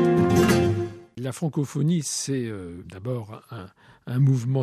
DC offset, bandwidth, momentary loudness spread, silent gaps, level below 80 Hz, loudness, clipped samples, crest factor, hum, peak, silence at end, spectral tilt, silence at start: under 0.1%; 14.5 kHz; 20 LU; none; -52 dBFS; -24 LUFS; under 0.1%; 16 dB; none; -8 dBFS; 0 s; -6 dB/octave; 0 s